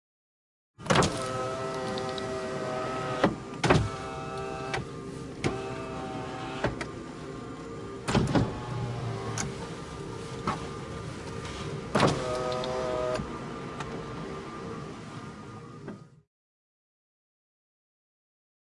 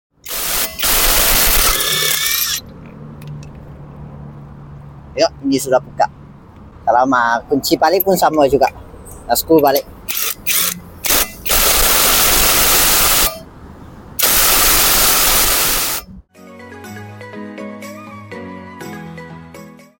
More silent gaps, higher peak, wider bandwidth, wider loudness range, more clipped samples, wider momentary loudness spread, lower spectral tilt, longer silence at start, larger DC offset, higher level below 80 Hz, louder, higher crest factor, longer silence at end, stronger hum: neither; second, -6 dBFS vs 0 dBFS; second, 11.5 kHz vs 17 kHz; about the same, 12 LU vs 12 LU; neither; second, 14 LU vs 23 LU; first, -5 dB/octave vs -1.5 dB/octave; first, 0.8 s vs 0.25 s; neither; second, -50 dBFS vs -30 dBFS; second, -32 LUFS vs -12 LUFS; first, 26 dB vs 16 dB; first, 2.45 s vs 0.3 s; neither